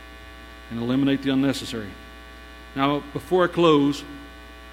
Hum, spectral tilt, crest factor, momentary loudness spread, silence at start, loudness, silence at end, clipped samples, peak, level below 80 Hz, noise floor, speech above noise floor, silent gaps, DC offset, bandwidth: none; -6 dB/octave; 20 dB; 24 LU; 0 s; -23 LUFS; 0 s; under 0.1%; -4 dBFS; -46 dBFS; -42 dBFS; 20 dB; none; under 0.1%; 15.5 kHz